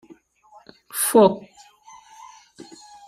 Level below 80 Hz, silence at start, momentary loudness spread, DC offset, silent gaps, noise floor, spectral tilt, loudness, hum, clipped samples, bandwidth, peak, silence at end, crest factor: -68 dBFS; 0.95 s; 27 LU; under 0.1%; none; -53 dBFS; -4 dB/octave; -18 LUFS; none; under 0.1%; 15.5 kHz; -2 dBFS; 1.7 s; 22 dB